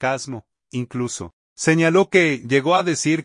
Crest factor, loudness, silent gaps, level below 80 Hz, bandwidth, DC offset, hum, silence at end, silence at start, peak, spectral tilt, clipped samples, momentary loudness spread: 16 dB; -19 LUFS; 1.33-1.56 s; -62 dBFS; 11 kHz; under 0.1%; none; 0 s; 0 s; -4 dBFS; -5 dB/octave; under 0.1%; 16 LU